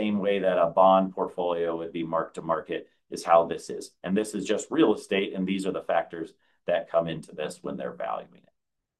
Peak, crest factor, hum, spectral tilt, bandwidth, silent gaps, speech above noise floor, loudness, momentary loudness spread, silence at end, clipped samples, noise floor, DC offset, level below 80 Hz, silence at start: -6 dBFS; 22 dB; none; -5.5 dB/octave; 12.5 kHz; none; 54 dB; -27 LUFS; 14 LU; 0.75 s; under 0.1%; -81 dBFS; under 0.1%; -68 dBFS; 0 s